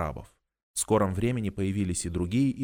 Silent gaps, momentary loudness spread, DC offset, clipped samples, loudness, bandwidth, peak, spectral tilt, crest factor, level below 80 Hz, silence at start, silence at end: 0.63-0.74 s; 10 LU; under 0.1%; under 0.1%; -28 LUFS; 19.5 kHz; -10 dBFS; -5.5 dB/octave; 18 dB; -46 dBFS; 0 s; 0 s